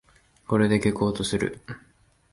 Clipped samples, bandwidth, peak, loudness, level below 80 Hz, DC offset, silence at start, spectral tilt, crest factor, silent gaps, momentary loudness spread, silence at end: under 0.1%; 11.5 kHz; -8 dBFS; -24 LUFS; -50 dBFS; under 0.1%; 0.5 s; -6 dB/octave; 18 dB; none; 20 LU; 0.55 s